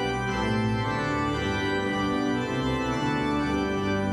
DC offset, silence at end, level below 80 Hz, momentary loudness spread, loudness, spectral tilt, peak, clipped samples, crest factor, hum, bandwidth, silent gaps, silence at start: under 0.1%; 0 s; -42 dBFS; 1 LU; -27 LUFS; -6 dB/octave; -14 dBFS; under 0.1%; 12 dB; none; 13 kHz; none; 0 s